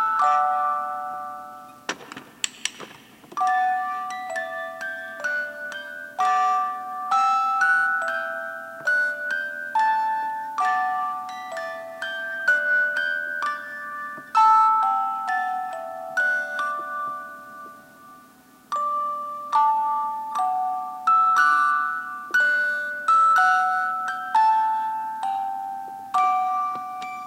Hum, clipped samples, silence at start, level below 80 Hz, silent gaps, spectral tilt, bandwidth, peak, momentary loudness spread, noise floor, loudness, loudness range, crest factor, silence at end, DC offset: none; under 0.1%; 0 s; -76 dBFS; none; -0.5 dB/octave; 16.5 kHz; -2 dBFS; 15 LU; -52 dBFS; -23 LUFS; 8 LU; 22 dB; 0 s; under 0.1%